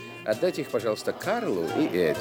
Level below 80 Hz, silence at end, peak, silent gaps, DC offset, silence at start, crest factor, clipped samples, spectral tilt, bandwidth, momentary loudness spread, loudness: -66 dBFS; 0 s; -12 dBFS; none; under 0.1%; 0 s; 16 dB; under 0.1%; -5.5 dB/octave; 18 kHz; 4 LU; -27 LUFS